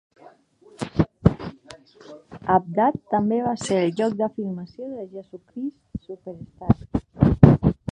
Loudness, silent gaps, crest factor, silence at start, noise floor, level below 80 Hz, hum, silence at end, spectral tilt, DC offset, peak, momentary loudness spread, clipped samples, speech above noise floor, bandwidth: -22 LUFS; none; 22 dB; 0.8 s; -53 dBFS; -38 dBFS; none; 0 s; -8 dB/octave; under 0.1%; 0 dBFS; 21 LU; under 0.1%; 29 dB; 10 kHz